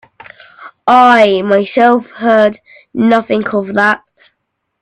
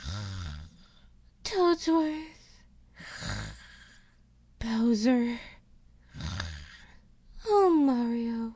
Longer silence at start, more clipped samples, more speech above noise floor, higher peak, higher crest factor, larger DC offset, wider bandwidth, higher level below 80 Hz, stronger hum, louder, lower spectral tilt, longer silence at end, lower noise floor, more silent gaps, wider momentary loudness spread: first, 0.6 s vs 0 s; neither; first, 59 dB vs 32 dB; first, 0 dBFS vs -14 dBFS; second, 12 dB vs 18 dB; neither; first, 9.8 kHz vs 8 kHz; second, -56 dBFS vs -48 dBFS; neither; first, -11 LUFS vs -29 LUFS; about the same, -6 dB/octave vs -6 dB/octave; first, 0.85 s vs 0 s; first, -69 dBFS vs -60 dBFS; neither; second, 8 LU vs 22 LU